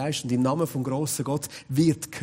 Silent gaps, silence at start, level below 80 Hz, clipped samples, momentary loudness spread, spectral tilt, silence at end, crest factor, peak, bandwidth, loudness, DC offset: none; 0 s; -60 dBFS; under 0.1%; 6 LU; -5.5 dB/octave; 0 s; 16 dB; -10 dBFS; 16 kHz; -26 LUFS; under 0.1%